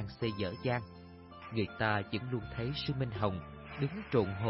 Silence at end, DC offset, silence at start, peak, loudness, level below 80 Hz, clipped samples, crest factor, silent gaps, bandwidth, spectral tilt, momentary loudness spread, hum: 0 s; under 0.1%; 0 s; -16 dBFS; -36 LUFS; -56 dBFS; under 0.1%; 18 dB; none; 5.8 kHz; -5 dB/octave; 14 LU; none